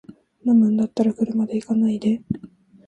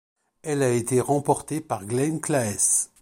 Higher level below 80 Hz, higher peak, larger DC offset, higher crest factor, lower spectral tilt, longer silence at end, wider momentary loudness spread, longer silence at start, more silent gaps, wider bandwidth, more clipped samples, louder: about the same, -58 dBFS vs -60 dBFS; about the same, -6 dBFS vs -6 dBFS; neither; about the same, 14 dB vs 18 dB; first, -8.5 dB/octave vs -4.5 dB/octave; first, 0.4 s vs 0.15 s; about the same, 11 LU vs 10 LU; second, 0.1 s vs 0.45 s; neither; second, 8.6 kHz vs 16.5 kHz; neither; first, -21 LUFS vs -24 LUFS